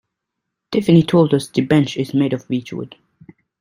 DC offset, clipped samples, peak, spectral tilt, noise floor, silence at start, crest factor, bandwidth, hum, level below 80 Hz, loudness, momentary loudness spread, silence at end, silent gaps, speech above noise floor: under 0.1%; under 0.1%; -2 dBFS; -7 dB/octave; -79 dBFS; 0.7 s; 16 dB; 12.5 kHz; none; -56 dBFS; -17 LUFS; 15 LU; 0.75 s; none; 63 dB